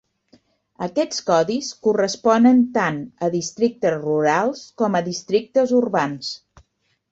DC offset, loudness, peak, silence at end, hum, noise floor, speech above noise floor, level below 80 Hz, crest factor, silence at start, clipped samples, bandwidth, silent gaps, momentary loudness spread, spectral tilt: under 0.1%; -20 LUFS; -4 dBFS; 0.75 s; none; -67 dBFS; 48 dB; -62 dBFS; 16 dB; 0.8 s; under 0.1%; 8 kHz; none; 10 LU; -5 dB/octave